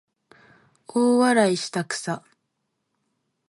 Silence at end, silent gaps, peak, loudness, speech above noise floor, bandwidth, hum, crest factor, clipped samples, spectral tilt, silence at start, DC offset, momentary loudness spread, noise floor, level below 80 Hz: 1.3 s; none; -6 dBFS; -22 LUFS; 55 dB; 11.5 kHz; none; 20 dB; under 0.1%; -4.5 dB/octave; 0.95 s; under 0.1%; 12 LU; -77 dBFS; -76 dBFS